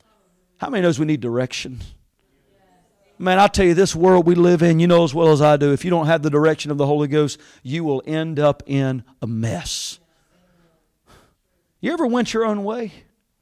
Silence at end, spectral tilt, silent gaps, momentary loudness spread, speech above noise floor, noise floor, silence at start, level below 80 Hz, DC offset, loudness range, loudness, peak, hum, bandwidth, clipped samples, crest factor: 0.5 s; -6 dB/octave; none; 14 LU; 50 dB; -67 dBFS; 0.6 s; -46 dBFS; under 0.1%; 10 LU; -18 LUFS; -4 dBFS; none; 14.5 kHz; under 0.1%; 14 dB